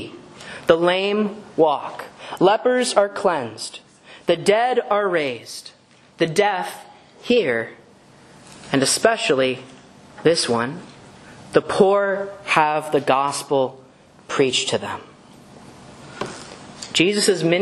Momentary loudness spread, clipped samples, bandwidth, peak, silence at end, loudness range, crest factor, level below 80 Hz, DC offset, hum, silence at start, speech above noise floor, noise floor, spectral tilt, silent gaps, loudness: 18 LU; under 0.1%; 13 kHz; 0 dBFS; 0 s; 4 LU; 22 dB; -62 dBFS; under 0.1%; none; 0 s; 29 dB; -49 dBFS; -3.5 dB/octave; none; -20 LUFS